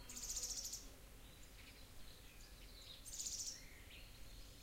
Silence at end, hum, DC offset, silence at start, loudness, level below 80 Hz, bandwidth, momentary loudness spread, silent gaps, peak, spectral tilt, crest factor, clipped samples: 0 s; none; under 0.1%; 0 s; -50 LUFS; -62 dBFS; 16 kHz; 16 LU; none; -32 dBFS; -0.5 dB/octave; 20 dB; under 0.1%